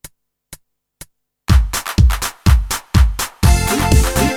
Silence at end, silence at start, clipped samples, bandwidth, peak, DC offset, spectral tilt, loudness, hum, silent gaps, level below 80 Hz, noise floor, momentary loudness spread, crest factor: 0 s; 0.05 s; under 0.1%; 18.5 kHz; 0 dBFS; under 0.1%; -5 dB/octave; -15 LUFS; none; none; -18 dBFS; -43 dBFS; 4 LU; 14 dB